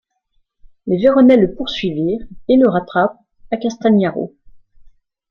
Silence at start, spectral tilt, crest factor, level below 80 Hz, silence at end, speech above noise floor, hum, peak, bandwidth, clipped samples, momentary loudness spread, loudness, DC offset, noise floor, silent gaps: 0.85 s; -7.5 dB/octave; 14 dB; -46 dBFS; 1.05 s; 49 dB; none; -2 dBFS; 6.8 kHz; under 0.1%; 14 LU; -15 LUFS; under 0.1%; -63 dBFS; none